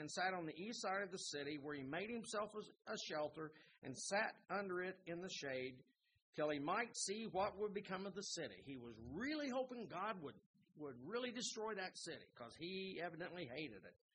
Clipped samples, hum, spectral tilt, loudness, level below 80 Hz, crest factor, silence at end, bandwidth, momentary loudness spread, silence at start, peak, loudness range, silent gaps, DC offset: under 0.1%; none; -3.5 dB/octave; -47 LUFS; -80 dBFS; 20 dB; 0.2 s; 10 kHz; 12 LU; 0 s; -28 dBFS; 3 LU; 3.78-3.82 s, 6.22-6.33 s, 10.46-10.54 s; under 0.1%